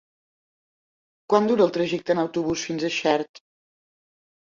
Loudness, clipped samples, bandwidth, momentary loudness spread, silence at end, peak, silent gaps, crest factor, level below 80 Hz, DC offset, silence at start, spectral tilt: -23 LUFS; under 0.1%; 7.6 kHz; 6 LU; 1 s; -4 dBFS; 3.29-3.34 s; 20 dB; -62 dBFS; under 0.1%; 1.3 s; -5 dB/octave